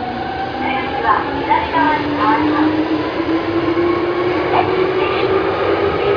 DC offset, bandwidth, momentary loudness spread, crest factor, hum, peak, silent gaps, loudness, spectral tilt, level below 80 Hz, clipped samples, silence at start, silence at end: under 0.1%; 5.4 kHz; 4 LU; 16 dB; none; 0 dBFS; none; -16 LUFS; -7.5 dB/octave; -42 dBFS; under 0.1%; 0 s; 0 s